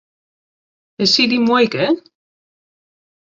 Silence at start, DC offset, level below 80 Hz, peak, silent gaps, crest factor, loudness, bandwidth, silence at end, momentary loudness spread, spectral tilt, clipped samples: 1 s; under 0.1%; -60 dBFS; -2 dBFS; none; 18 dB; -15 LUFS; 7.6 kHz; 1.25 s; 6 LU; -4 dB/octave; under 0.1%